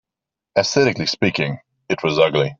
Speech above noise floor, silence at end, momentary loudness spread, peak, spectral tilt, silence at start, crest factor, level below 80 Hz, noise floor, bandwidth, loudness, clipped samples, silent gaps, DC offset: 68 dB; 0.05 s; 9 LU; -2 dBFS; -4.5 dB/octave; 0.55 s; 18 dB; -56 dBFS; -86 dBFS; 7.8 kHz; -19 LUFS; under 0.1%; none; under 0.1%